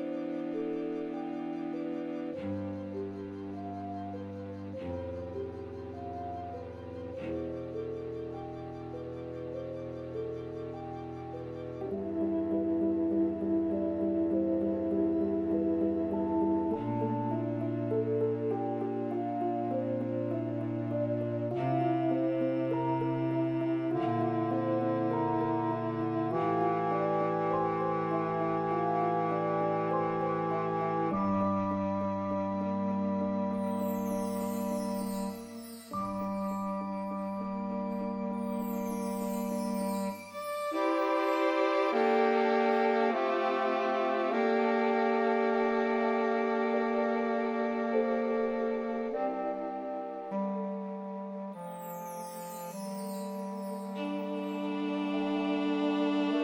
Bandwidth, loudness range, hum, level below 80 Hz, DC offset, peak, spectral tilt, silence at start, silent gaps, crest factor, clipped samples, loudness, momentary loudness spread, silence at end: 16.5 kHz; 11 LU; none; -66 dBFS; under 0.1%; -16 dBFS; -7 dB/octave; 0 s; none; 16 dB; under 0.1%; -32 LUFS; 12 LU; 0 s